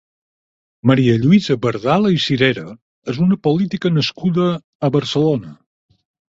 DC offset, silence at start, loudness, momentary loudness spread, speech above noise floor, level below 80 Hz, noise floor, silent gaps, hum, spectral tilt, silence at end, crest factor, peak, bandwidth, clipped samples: under 0.1%; 0.85 s; -17 LUFS; 8 LU; over 74 dB; -52 dBFS; under -90 dBFS; 2.82-3.02 s, 4.64-4.80 s; none; -7 dB/octave; 0.75 s; 16 dB; -2 dBFS; 7.8 kHz; under 0.1%